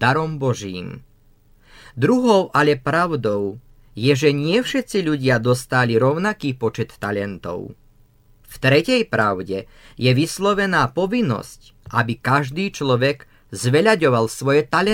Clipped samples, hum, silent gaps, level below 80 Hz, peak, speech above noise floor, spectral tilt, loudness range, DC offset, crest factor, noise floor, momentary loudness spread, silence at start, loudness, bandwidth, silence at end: under 0.1%; none; none; -50 dBFS; -2 dBFS; 34 dB; -5.5 dB/octave; 3 LU; under 0.1%; 18 dB; -53 dBFS; 13 LU; 0 s; -19 LUFS; 16.5 kHz; 0 s